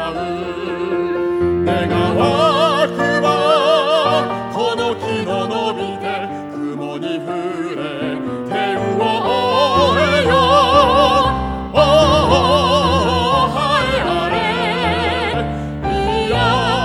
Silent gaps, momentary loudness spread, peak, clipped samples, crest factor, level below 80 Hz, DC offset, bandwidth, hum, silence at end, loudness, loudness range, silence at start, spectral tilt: none; 11 LU; 0 dBFS; under 0.1%; 16 dB; -34 dBFS; under 0.1%; 15 kHz; none; 0 s; -16 LUFS; 9 LU; 0 s; -5.5 dB/octave